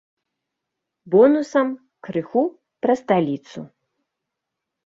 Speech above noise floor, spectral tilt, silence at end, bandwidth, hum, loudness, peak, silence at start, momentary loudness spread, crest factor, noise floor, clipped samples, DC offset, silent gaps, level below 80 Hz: 63 dB; -7.5 dB/octave; 1.2 s; 7.8 kHz; none; -20 LUFS; -4 dBFS; 1.05 s; 17 LU; 18 dB; -82 dBFS; under 0.1%; under 0.1%; none; -66 dBFS